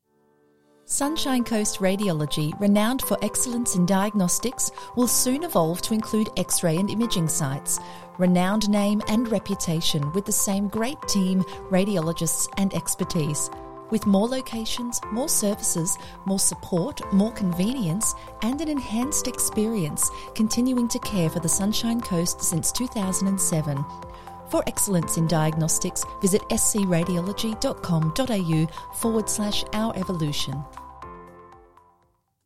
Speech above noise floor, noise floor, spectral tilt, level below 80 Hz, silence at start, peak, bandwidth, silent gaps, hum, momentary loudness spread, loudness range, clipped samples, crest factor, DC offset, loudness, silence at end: 43 dB; -67 dBFS; -4.5 dB/octave; -46 dBFS; 0 s; -8 dBFS; 16.5 kHz; none; none; 6 LU; 2 LU; under 0.1%; 18 dB; 1%; -24 LUFS; 0 s